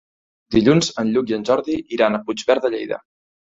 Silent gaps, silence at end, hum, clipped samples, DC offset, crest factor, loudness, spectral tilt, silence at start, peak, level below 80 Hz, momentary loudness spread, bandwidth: none; 0.55 s; none; under 0.1%; under 0.1%; 18 dB; -19 LUFS; -5.5 dB/octave; 0.5 s; -2 dBFS; -50 dBFS; 10 LU; 8 kHz